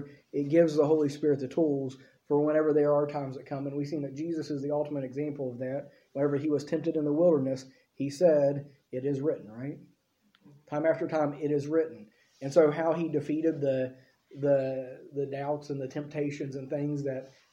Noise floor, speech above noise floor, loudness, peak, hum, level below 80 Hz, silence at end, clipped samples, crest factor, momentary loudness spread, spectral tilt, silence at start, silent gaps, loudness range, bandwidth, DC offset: -69 dBFS; 41 dB; -30 LUFS; -10 dBFS; none; -76 dBFS; 0.25 s; under 0.1%; 20 dB; 13 LU; -8 dB/octave; 0 s; none; 5 LU; 11 kHz; under 0.1%